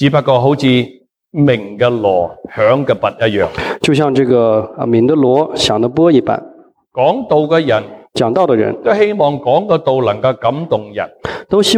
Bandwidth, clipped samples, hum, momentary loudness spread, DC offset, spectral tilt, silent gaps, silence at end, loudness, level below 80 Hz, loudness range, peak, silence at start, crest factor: 14.5 kHz; under 0.1%; none; 7 LU; under 0.1%; -6 dB/octave; none; 0 s; -13 LUFS; -48 dBFS; 2 LU; 0 dBFS; 0 s; 12 dB